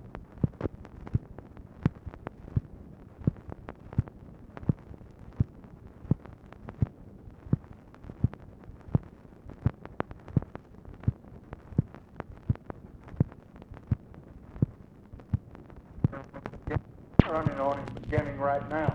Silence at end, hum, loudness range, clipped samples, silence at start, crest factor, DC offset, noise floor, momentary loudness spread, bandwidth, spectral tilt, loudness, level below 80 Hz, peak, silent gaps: 0 s; none; 5 LU; under 0.1%; 0 s; 32 dB; under 0.1%; -49 dBFS; 20 LU; 6 kHz; -10 dB/octave; -33 LUFS; -46 dBFS; 0 dBFS; none